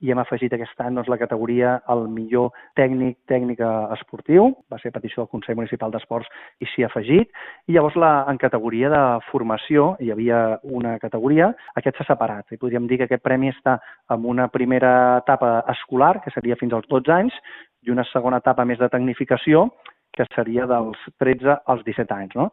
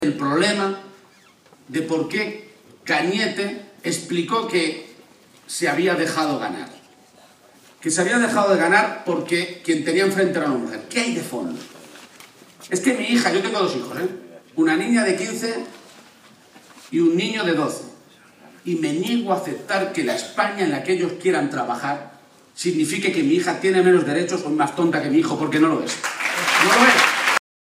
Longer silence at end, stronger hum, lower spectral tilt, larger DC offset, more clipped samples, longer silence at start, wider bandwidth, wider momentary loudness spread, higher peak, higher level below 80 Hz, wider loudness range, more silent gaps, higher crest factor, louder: second, 0.05 s vs 0.35 s; neither; first, -6 dB/octave vs -4 dB/octave; neither; neither; about the same, 0 s vs 0 s; second, 4.1 kHz vs 15.5 kHz; about the same, 11 LU vs 12 LU; about the same, -2 dBFS vs 0 dBFS; first, -56 dBFS vs -74 dBFS; about the same, 3 LU vs 5 LU; neither; about the same, 18 dB vs 22 dB; about the same, -20 LUFS vs -20 LUFS